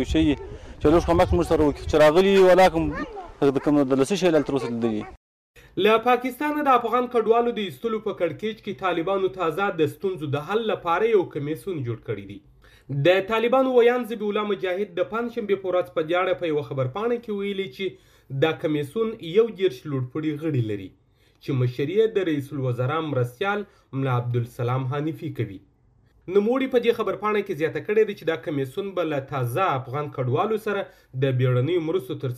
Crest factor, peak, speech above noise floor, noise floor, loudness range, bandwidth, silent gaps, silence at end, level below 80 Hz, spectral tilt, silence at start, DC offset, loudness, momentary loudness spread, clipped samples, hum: 16 dB; -6 dBFS; 37 dB; -59 dBFS; 7 LU; 15.5 kHz; 5.17-5.54 s; 0 s; -44 dBFS; -7 dB/octave; 0 s; under 0.1%; -23 LUFS; 11 LU; under 0.1%; none